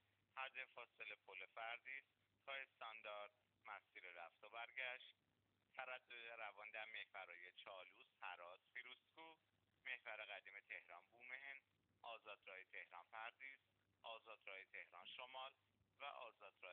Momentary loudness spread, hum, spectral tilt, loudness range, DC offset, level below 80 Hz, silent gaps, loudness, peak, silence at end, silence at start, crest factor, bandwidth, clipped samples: 9 LU; none; 3 dB/octave; 3 LU; under 0.1%; under -90 dBFS; none; -57 LUFS; -36 dBFS; 0 s; 0.35 s; 22 dB; 4.3 kHz; under 0.1%